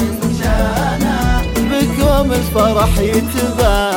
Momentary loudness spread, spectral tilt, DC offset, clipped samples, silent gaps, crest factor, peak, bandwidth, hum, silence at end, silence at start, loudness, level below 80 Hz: 3 LU; -5.5 dB/octave; under 0.1%; under 0.1%; none; 14 dB; 0 dBFS; 17 kHz; none; 0 s; 0 s; -15 LUFS; -20 dBFS